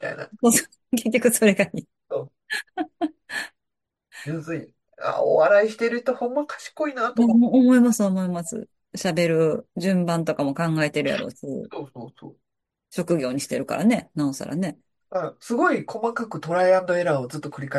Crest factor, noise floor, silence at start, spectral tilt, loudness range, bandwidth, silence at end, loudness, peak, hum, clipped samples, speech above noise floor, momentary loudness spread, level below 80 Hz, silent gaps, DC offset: 20 dB; -83 dBFS; 0 s; -5 dB/octave; 7 LU; 12.5 kHz; 0 s; -23 LUFS; -4 dBFS; none; under 0.1%; 61 dB; 15 LU; -68 dBFS; none; under 0.1%